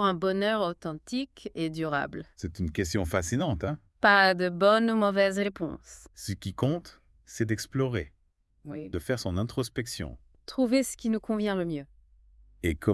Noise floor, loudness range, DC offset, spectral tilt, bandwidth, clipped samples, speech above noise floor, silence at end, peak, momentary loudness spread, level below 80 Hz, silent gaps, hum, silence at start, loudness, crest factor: -68 dBFS; 8 LU; under 0.1%; -5 dB/octave; 12 kHz; under 0.1%; 40 dB; 0 s; -6 dBFS; 15 LU; -52 dBFS; none; none; 0 s; -28 LUFS; 22 dB